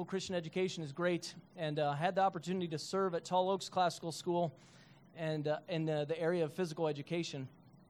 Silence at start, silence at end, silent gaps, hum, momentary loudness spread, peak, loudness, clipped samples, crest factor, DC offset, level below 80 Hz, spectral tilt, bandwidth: 0 s; 0.4 s; none; none; 7 LU; -20 dBFS; -37 LUFS; under 0.1%; 18 dB; under 0.1%; -80 dBFS; -5.5 dB/octave; 14 kHz